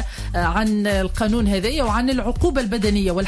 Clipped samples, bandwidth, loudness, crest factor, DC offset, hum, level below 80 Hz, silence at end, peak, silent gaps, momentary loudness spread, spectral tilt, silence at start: under 0.1%; 11 kHz; -20 LUFS; 12 dB; under 0.1%; none; -26 dBFS; 0 s; -8 dBFS; none; 2 LU; -5.5 dB/octave; 0 s